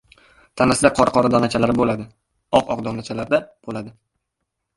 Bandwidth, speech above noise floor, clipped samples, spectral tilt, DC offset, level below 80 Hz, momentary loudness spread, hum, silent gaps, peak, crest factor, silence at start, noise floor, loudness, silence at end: 11.5 kHz; 59 dB; under 0.1%; -5 dB/octave; under 0.1%; -48 dBFS; 16 LU; none; none; 0 dBFS; 20 dB; 0.55 s; -78 dBFS; -19 LUFS; 0.85 s